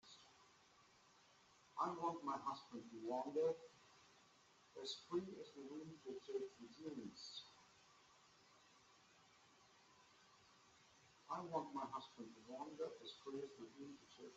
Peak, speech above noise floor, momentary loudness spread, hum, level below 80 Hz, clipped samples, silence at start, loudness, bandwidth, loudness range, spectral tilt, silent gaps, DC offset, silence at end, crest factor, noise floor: -30 dBFS; 23 dB; 24 LU; none; under -90 dBFS; under 0.1%; 0.05 s; -50 LUFS; 8 kHz; 15 LU; -4 dB/octave; none; under 0.1%; 0 s; 22 dB; -72 dBFS